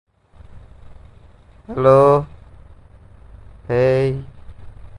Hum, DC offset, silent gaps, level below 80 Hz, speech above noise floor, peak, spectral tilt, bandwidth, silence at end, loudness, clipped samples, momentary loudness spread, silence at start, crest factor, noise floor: none; under 0.1%; none; -44 dBFS; 31 dB; 0 dBFS; -8.5 dB/octave; 10.5 kHz; 0 s; -16 LUFS; under 0.1%; 18 LU; 0.55 s; 20 dB; -46 dBFS